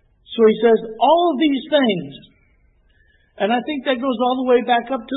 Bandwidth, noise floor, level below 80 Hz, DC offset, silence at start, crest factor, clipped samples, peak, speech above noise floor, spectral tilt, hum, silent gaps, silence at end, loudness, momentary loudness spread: 4.1 kHz; -57 dBFS; -58 dBFS; under 0.1%; 0.3 s; 14 dB; under 0.1%; -4 dBFS; 40 dB; -10 dB/octave; none; none; 0 s; -18 LUFS; 8 LU